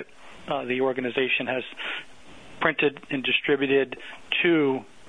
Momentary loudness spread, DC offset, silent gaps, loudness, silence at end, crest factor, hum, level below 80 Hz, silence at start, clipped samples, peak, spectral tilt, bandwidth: 11 LU; 0.2%; none; -25 LUFS; 0.25 s; 22 dB; none; -62 dBFS; 0 s; under 0.1%; -4 dBFS; -6 dB/octave; 10 kHz